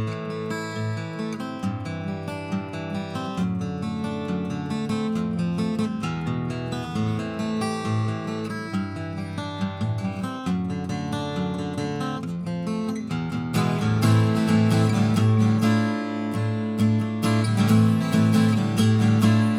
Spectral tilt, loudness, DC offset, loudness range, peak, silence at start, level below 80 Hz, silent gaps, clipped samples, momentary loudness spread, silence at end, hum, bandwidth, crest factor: -7 dB/octave; -24 LUFS; under 0.1%; 8 LU; -8 dBFS; 0 s; -58 dBFS; none; under 0.1%; 11 LU; 0 s; none; 15.5 kHz; 16 dB